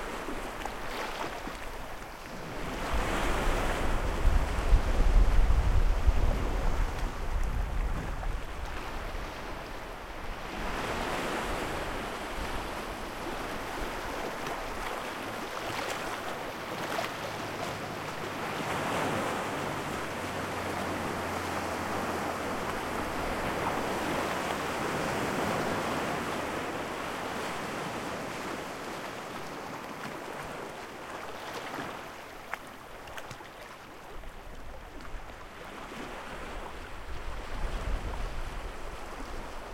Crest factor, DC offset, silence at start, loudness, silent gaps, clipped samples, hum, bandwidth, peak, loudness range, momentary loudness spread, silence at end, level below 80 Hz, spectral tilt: 22 dB; 0.1%; 0 s; -34 LUFS; none; under 0.1%; none; 16.5 kHz; -10 dBFS; 11 LU; 12 LU; 0 s; -36 dBFS; -4.5 dB/octave